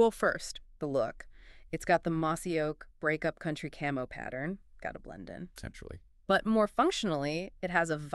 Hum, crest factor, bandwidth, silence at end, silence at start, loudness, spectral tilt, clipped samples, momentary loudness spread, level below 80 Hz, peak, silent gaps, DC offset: none; 20 dB; 13 kHz; 0 s; 0 s; -32 LUFS; -5 dB/octave; under 0.1%; 17 LU; -54 dBFS; -12 dBFS; none; under 0.1%